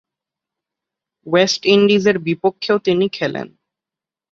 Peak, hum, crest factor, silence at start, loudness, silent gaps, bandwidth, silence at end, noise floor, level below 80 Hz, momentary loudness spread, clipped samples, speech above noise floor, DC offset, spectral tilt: -2 dBFS; none; 18 dB; 1.25 s; -16 LUFS; none; 7.6 kHz; 0.85 s; -88 dBFS; -60 dBFS; 10 LU; under 0.1%; 73 dB; under 0.1%; -5 dB/octave